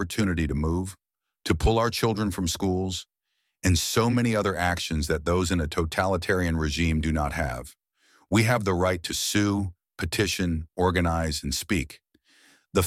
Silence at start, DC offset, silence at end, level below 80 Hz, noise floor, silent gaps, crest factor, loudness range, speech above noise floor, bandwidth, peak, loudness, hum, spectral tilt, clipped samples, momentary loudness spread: 0 s; under 0.1%; 0 s; -38 dBFS; -78 dBFS; none; 18 dB; 2 LU; 53 dB; 16.5 kHz; -8 dBFS; -26 LUFS; none; -5 dB/octave; under 0.1%; 7 LU